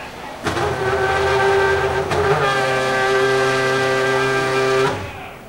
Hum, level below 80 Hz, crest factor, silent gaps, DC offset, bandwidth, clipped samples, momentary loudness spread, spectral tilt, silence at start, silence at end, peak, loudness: none; -42 dBFS; 14 dB; none; 0.2%; 16 kHz; under 0.1%; 6 LU; -4.5 dB/octave; 0 s; 0 s; -4 dBFS; -18 LUFS